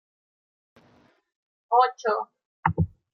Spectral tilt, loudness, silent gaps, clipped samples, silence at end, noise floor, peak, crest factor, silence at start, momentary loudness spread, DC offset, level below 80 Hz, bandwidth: -7 dB/octave; -25 LUFS; 2.45-2.63 s; under 0.1%; 0.25 s; -61 dBFS; -6 dBFS; 24 dB; 1.7 s; 8 LU; under 0.1%; -54 dBFS; 6.6 kHz